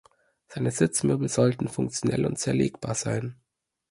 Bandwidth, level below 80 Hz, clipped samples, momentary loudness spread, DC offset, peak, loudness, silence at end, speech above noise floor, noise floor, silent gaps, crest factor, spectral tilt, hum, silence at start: 11.5 kHz; -56 dBFS; under 0.1%; 7 LU; under 0.1%; -8 dBFS; -26 LUFS; 0.55 s; 55 dB; -80 dBFS; none; 20 dB; -5.5 dB/octave; none; 0.5 s